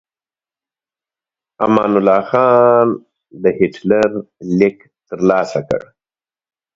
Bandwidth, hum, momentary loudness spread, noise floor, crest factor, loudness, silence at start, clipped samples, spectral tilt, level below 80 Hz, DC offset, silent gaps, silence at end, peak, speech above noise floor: 7.8 kHz; none; 11 LU; under -90 dBFS; 16 dB; -15 LUFS; 1.6 s; under 0.1%; -7.5 dB/octave; -54 dBFS; under 0.1%; none; 0.95 s; 0 dBFS; over 76 dB